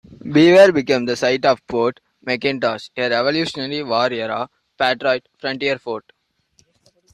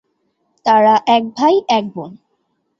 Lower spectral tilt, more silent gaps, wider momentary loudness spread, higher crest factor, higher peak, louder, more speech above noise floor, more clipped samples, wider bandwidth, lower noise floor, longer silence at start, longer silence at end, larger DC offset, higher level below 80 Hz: about the same, -5 dB/octave vs -5 dB/octave; neither; second, 14 LU vs 18 LU; about the same, 16 dB vs 14 dB; about the same, -2 dBFS vs -2 dBFS; second, -18 LUFS vs -14 LUFS; second, 43 dB vs 53 dB; neither; first, 11.5 kHz vs 7.4 kHz; second, -60 dBFS vs -67 dBFS; second, 0.1 s vs 0.65 s; first, 1.15 s vs 0.65 s; neither; about the same, -58 dBFS vs -62 dBFS